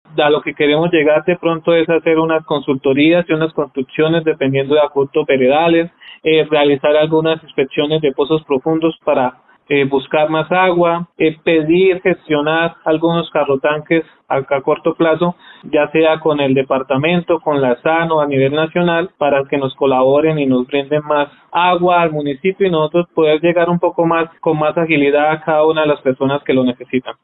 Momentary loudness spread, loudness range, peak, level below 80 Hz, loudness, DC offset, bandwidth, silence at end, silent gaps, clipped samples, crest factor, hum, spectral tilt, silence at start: 5 LU; 2 LU; 0 dBFS; -54 dBFS; -14 LUFS; under 0.1%; 4.1 kHz; 0.1 s; none; under 0.1%; 14 dB; none; -11.5 dB/octave; 0.15 s